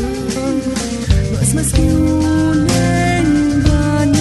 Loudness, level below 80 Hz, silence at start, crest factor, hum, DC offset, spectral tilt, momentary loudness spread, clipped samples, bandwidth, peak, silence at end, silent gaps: -15 LUFS; -22 dBFS; 0 s; 12 dB; none; under 0.1%; -5.5 dB/octave; 5 LU; under 0.1%; 12.5 kHz; -2 dBFS; 0 s; none